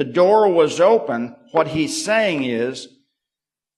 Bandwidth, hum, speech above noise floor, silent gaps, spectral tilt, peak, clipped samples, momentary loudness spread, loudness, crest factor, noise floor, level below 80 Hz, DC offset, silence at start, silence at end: 13 kHz; none; 71 dB; none; -4.5 dB/octave; -4 dBFS; under 0.1%; 11 LU; -18 LUFS; 16 dB; -88 dBFS; -60 dBFS; under 0.1%; 0 s; 0.9 s